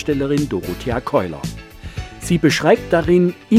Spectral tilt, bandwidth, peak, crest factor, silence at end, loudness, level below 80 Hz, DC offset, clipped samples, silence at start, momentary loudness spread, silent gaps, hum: -6 dB/octave; 16 kHz; 0 dBFS; 18 dB; 0 s; -18 LUFS; -38 dBFS; under 0.1%; under 0.1%; 0 s; 17 LU; none; none